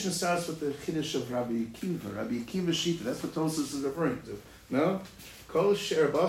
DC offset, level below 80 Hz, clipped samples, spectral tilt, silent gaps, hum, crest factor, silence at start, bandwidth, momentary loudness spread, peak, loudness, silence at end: under 0.1%; -60 dBFS; under 0.1%; -5 dB/octave; none; none; 18 dB; 0 s; 16 kHz; 9 LU; -14 dBFS; -31 LUFS; 0 s